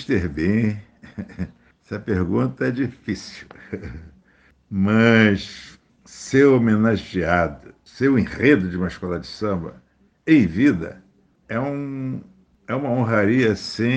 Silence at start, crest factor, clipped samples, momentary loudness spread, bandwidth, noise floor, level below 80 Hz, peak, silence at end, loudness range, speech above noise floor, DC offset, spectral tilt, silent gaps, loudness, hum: 0 s; 20 dB; under 0.1%; 19 LU; 9 kHz; -57 dBFS; -46 dBFS; 0 dBFS; 0 s; 8 LU; 37 dB; under 0.1%; -7 dB/octave; none; -20 LUFS; none